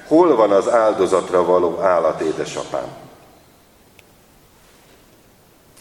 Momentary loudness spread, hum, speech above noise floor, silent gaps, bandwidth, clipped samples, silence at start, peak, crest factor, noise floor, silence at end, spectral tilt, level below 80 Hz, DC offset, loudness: 12 LU; none; 35 dB; none; 18 kHz; under 0.1%; 0.05 s; 0 dBFS; 18 dB; -51 dBFS; 2.75 s; -5.5 dB/octave; -58 dBFS; under 0.1%; -17 LUFS